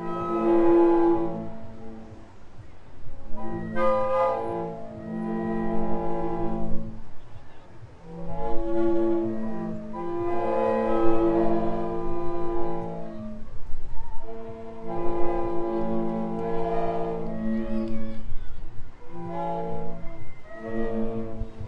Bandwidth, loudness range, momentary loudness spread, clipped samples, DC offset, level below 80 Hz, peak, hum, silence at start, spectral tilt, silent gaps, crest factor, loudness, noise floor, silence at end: 4.3 kHz; 8 LU; 20 LU; under 0.1%; under 0.1%; -38 dBFS; -6 dBFS; none; 0 s; -9 dB/octave; none; 16 dB; -27 LUFS; -42 dBFS; 0 s